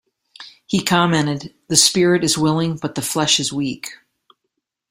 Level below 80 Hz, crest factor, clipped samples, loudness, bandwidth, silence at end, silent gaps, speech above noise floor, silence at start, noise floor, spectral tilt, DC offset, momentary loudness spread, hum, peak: -56 dBFS; 20 dB; under 0.1%; -17 LUFS; 16 kHz; 0.95 s; none; 58 dB; 0.4 s; -76 dBFS; -3.5 dB/octave; under 0.1%; 12 LU; none; 0 dBFS